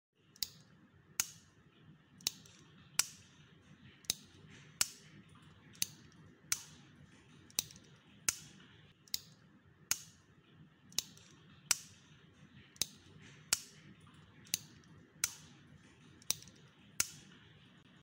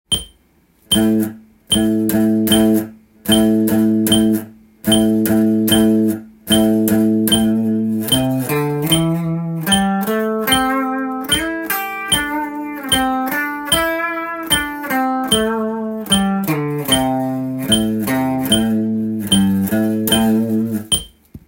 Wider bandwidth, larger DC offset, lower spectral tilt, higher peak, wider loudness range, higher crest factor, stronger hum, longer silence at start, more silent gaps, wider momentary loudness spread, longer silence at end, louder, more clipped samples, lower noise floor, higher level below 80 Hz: about the same, 16 kHz vs 17 kHz; neither; second, 0 dB/octave vs -4 dB/octave; second, -10 dBFS vs 0 dBFS; about the same, 3 LU vs 3 LU; first, 36 dB vs 16 dB; neither; first, 0.4 s vs 0.1 s; neither; first, 24 LU vs 7 LU; first, 0.45 s vs 0.1 s; second, -39 LUFS vs -16 LUFS; neither; first, -64 dBFS vs -55 dBFS; second, -76 dBFS vs -42 dBFS